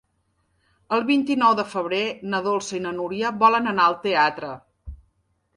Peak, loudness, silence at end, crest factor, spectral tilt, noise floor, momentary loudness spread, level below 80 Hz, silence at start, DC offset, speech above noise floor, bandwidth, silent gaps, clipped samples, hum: -4 dBFS; -22 LUFS; 0.6 s; 20 dB; -4.5 dB/octave; -69 dBFS; 10 LU; -52 dBFS; 0.9 s; under 0.1%; 48 dB; 11.5 kHz; none; under 0.1%; none